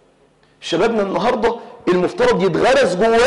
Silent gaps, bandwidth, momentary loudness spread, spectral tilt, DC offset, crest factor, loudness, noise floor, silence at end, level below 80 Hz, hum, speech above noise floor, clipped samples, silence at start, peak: none; 11.5 kHz; 8 LU; -5 dB/octave; under 0.1%; 10 dB; -17 LUFS; -54 dBFS; 0 s; -44 dBFS; none; 39 dB; under 0.1%; 0.6 s; -8 dBFS